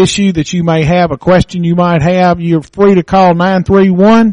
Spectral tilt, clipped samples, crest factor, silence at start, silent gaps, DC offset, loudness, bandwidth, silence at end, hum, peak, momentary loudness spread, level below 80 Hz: -6.5 dB/octave; under 0.1%; 8 dB; 0 s; none; under 0.1%; -9 LUFS; 10.5 kHz; 0 s; none; 0 dBFS; 5 LU; -34 dBFS